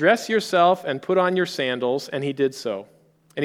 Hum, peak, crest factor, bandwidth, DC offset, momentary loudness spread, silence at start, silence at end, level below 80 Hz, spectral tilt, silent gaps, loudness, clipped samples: none; -4 dBFS; 18 dB; 16.5 kHz; under 0.1%; 12 LU; 0 s; 0 s; -74 dBFS; -5 dB/octave; none; -22 LUFS; under 0.1%